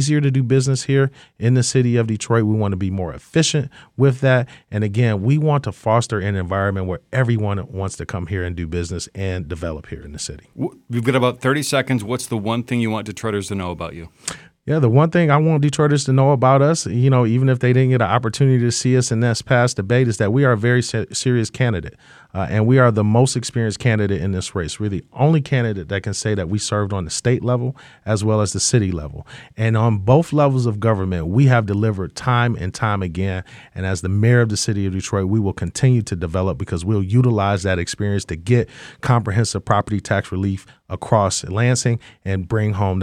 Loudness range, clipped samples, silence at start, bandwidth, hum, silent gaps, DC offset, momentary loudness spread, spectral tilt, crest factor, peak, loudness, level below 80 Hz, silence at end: 6 LU; under 0.1%; 0 s; 12.5 kHz; none; none; under 0.1%; 11 LU; -6 dB/octave; 18 dB; 0 dBFS; -19 LUFS; -44 dBFS; 0 s